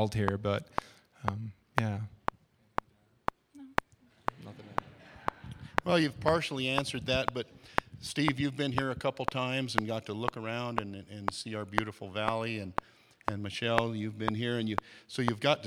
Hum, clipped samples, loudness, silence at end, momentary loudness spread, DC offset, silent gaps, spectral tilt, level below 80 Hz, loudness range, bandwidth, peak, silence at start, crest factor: none; under 0.1%; -34 LUFS; 0 s; 10 LU; under 0.1%; none; -5.5 dB/octave; -56 dBFS; 6 LU; 16.5 kHz; -4 dBFS; 0 s; 30 dB